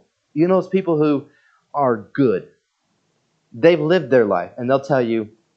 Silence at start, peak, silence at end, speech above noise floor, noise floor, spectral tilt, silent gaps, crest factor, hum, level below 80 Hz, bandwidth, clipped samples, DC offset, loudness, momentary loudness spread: 0.35 s; 0 dBFS; 0.3 s; 51 dB; -68 dBFS; -8 dB/octave; none; 20 dB; none; -70 dBFS; 7.4 kHz; under 0.1%; under 0.1%; -18 LUFS; 9 LU